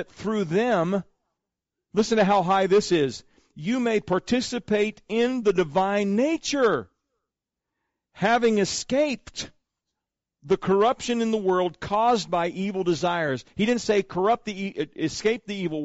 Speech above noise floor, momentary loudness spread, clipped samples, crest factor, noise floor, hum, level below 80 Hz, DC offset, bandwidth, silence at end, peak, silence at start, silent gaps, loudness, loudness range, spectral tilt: 63 dB; 8 LU; under 0.1%; 12 dB; -86 dBFS; none; -58 dBFS; under 0.1%; 8 kHz; 0 s; -12 dBFS; 0 s; none; -24 LUFS; 2 LU; -4 dB/octave